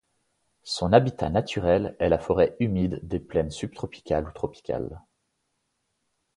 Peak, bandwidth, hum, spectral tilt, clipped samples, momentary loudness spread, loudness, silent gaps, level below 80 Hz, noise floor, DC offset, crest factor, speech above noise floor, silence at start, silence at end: -2 dBFS; 11 kHz; none; -6.5 dB/octave; under 0.1%; 13 LU; -26 LUFS; none; -44 dBFS; -76 dBFS; under 0.1%; 24 dB; 51 dB; 0.65 s; 1.4 s